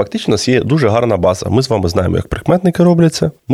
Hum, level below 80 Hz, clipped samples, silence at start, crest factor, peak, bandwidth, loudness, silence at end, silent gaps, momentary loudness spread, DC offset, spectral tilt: none; -38 dBFS; under 0.1%; 0 s; 12 dB; 0 dBFS; 14 kHz; -13 LUFS; 0 s; none; 5 LU; under 0.1%; -6.5 dB/octave